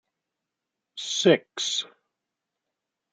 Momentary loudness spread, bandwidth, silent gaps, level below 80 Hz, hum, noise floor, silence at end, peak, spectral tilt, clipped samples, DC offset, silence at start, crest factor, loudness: 19 LU; 9.4 kHz; none; -78 dBFS; none; -85 dBFS; 1.25 s; -6 dBFS; -3 dB/octave; under 0.1%; under 0.1%; 0.95 s; 24 dB; -24 LUFS